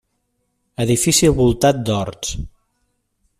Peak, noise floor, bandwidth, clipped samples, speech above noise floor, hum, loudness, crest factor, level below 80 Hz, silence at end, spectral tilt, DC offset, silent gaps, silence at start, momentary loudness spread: -2 dBFS; -70 dBFS; 15.5 kHz; under 0.1%; 53 dB; none; -17 LUFS; 16 dB; -36 dBFS; 0.9 s; -4.5 dB/octave; under 0.1%; none; 0.8 s; 18 LU